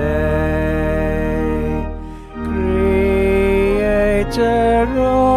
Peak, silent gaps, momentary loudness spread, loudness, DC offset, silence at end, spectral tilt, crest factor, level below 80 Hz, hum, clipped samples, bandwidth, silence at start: -4 dBFS; none; 9 LU; -17 LUFS; under 0.1%; 0 s; -7.5 dB/octave; 12 dB; -26 dBFS; none; under 0.1%; 15 kHz; 0 s